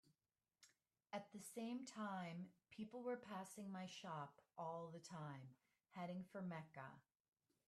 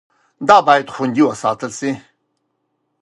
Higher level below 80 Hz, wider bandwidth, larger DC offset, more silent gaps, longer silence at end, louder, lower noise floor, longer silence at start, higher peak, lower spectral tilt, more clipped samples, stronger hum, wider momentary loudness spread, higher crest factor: second, under -90 dBFS vs -60 dBFS; first, 13 kHz vs 11.5 kHz; neither; neither; second, 0.7 s vs 1.05 s; second, -54 LUFS vs -15 LUFS; first, under -90 dBFS vs -70 dBFS; second, 0.05 s vs 0.4 s; second, -36 dBFS vs 0 dBFS; about the same, -5.5 dB/octave vs -4.5 dB/octave; neither; neither; second, 9 LU vs 13 LU; about the same, 18 dB vs 18 dB